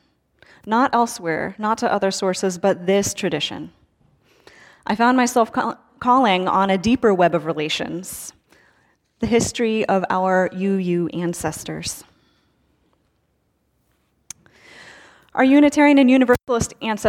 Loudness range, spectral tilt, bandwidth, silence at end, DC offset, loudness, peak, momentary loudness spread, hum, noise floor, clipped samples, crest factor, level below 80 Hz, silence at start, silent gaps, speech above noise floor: 9 LU; -4.5 dB/octave; 16.5 kHz; 0 s; under 0.1%; -19 LUFS; -4 dBFS; 15 LU; none; -67 dBFS; under 0.1%; 16 dB; -50 dBFS; 0.65 s; none; 49 dB